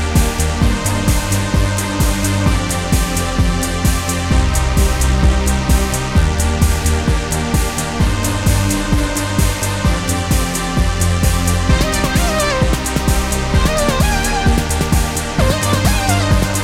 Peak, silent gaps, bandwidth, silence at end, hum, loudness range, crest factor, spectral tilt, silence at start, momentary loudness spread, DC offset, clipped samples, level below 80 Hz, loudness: 0 dBFS; none; 16.5 kHz; 0 s; none; 1 LU; 14 dB; -4.5 dB/octave; 0 s; 3 LU; under 0.1%; under 0.1%; -18 dBFS; -16 LUFS